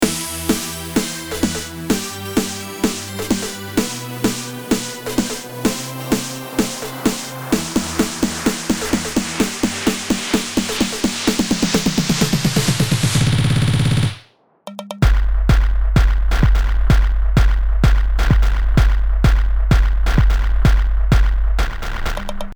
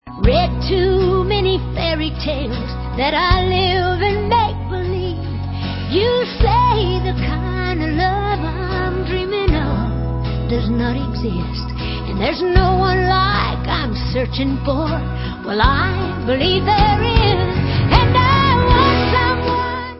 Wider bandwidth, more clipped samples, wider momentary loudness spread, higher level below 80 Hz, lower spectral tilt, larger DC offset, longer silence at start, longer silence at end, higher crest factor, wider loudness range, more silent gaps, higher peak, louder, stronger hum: first, over 20 kHz vs 5.8 kHz; neither; second, 6 LU vs 9 LU; first, -18 dBFS vs -24 dBFS; second, -4.5 dB/octave vs -9.5 dB/octave; neither; about the same, 0 s vs 0.05 s; about the same, 0 s vs 0 s; about the same, 14 dB vs 16 dB; about the same, 5 LU vs 5 LU; neither; about the same, -2 dBFS vs 0 dBFS; about the same, -19 LUFS vs -17 LUFS; neither